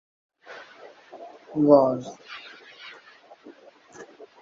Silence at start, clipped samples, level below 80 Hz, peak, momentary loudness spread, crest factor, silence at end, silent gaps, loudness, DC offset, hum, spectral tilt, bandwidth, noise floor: 0.5 s; under 0.1%; -70 dBFS; -2 dBFS; 29 LU; 24 dB; 0.35 s; none; -21 LUFS; under 0.1%; none; -7.5 dB/octave; 7.4 kHz; -51 dBFS